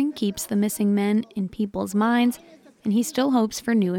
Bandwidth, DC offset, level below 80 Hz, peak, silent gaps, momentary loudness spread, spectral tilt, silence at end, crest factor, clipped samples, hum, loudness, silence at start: 17.5 kHz; under 0.1%; -58 dBFS; -10 dBFS; none; 7 LU; -5.5 dB/octave; 0 s; 14 dB; under 0.1%; none; -23 LUFS; 0 s